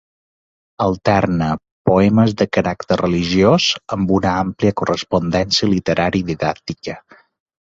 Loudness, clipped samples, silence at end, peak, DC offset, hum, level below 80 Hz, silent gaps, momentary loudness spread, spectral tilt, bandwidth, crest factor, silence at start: -17 LUFS; under 0.1%; 0.75 s; -2 dBFS; under 0.1%; none; -40 dBFS; 1.71-1.85 s; 8 LU; -5.5 dB/octave; 7.8 kHz; 16 dB; 0.8 s